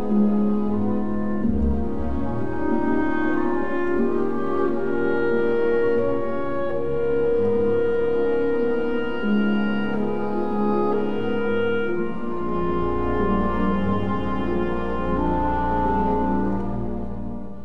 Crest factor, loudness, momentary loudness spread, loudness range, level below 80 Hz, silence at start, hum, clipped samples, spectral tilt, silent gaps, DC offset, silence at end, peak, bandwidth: 12 dB; -23 LUFS; 6 LU; 2 LU; -36 dBFS; 0 s; none; under 0.1%; -9.5 dB/octave; none; 5%; 0 s; -10 dBFS; 5.6 kHz